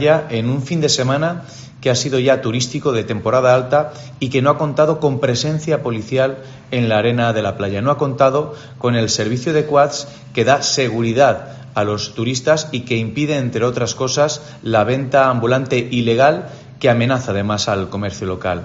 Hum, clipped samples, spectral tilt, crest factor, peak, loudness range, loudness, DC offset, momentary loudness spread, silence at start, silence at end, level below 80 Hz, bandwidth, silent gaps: none; under 0.1%; -4.5 dB/octave; 16 dB; 0 dBFS; 2 LU; -17 LUFS; under 0.1%; 8 LU; 0 s; 0 s; -52 dBFS; 8 kHz; none